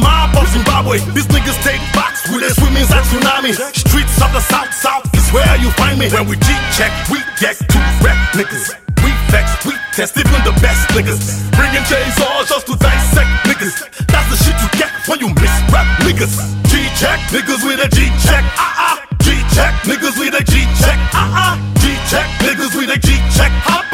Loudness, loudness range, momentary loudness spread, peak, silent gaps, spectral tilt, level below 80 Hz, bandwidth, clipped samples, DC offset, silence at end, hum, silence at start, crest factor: -12 LUFS; 1 LU; 4 LU; 0 dBFS; none; -4 dB/octave; -16 dBFS; 16.5 kHz; under 0.1%; under 0.1%; 0 s; none; 0 s; 12 dB